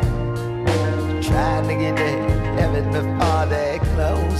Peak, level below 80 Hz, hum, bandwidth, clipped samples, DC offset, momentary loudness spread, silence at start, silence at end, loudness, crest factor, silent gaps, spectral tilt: -4 dBFS; -28 dBFS; none; 14 kHz; under 0.1%; under 0.1%; 3 LU; 0 s; 0 s; -21 LUFS; 16 dB; none; -7 dB/octave